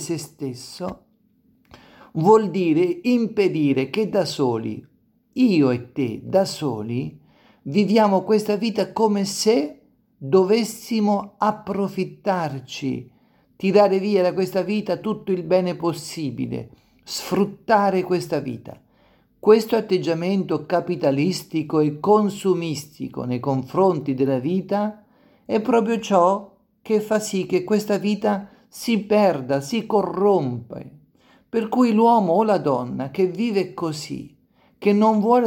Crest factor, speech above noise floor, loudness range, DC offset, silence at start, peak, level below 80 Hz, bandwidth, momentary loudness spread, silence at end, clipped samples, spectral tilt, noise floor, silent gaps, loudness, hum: 18 dB; 40 dB; 3 LU; under 0.1%; 0 s; -2 dBFS; -64 dBFS; 17 kHz; 13 LU; 0 s; under 0.1%; -6 dB/octave; -61 dBFS; none; -21 LUFS; none